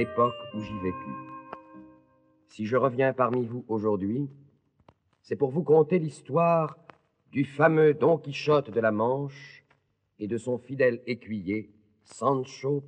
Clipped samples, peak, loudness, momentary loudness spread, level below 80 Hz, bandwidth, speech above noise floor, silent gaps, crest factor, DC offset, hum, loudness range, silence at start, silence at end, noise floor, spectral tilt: under 0.1%; -8 dBFS; -27 LUFS; 16 LU; -70 dBFS; 9.2 kHz; 43 dB; none; 20 dB; under 0.1%; none; 6 LU; 0 s; 0 s; -69 dBFS; -7.5 dB/octave